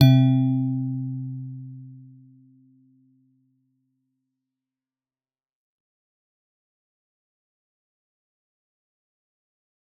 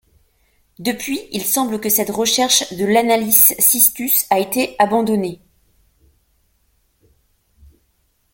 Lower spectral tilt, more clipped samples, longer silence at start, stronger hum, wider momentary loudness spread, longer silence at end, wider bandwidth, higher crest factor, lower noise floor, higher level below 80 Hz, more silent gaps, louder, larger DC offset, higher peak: first, -8 dB/octave vs -2 dB/octave; neither; second, 0 s vs 0.8 s; neither; first, 24 LU vs 13 LU; first, 8 s vs 3 s; second, 4.2 kHz vs 17 kHz; about the same, 24 dB vs 20 dB; first, under -90 dBFS vs -63 dBFS; second, -72 dBFS vs -56 dBFS; neither; second, -23 LUFS vs -15 LUFS; neither; second, -4 dBFS vs 0 dBFS